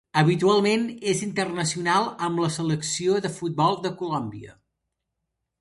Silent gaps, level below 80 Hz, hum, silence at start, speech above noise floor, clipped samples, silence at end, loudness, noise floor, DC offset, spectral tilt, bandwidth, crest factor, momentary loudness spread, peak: none; -62 dBFS; none; 0.15 s; 57 dB; under 0.1%; 1.1 s; -24 LUFS; -81 dBFS; under 0.1%; -5 dB/octave; 11.5 kHz; 22 dB; 9 LU; -4 dBFS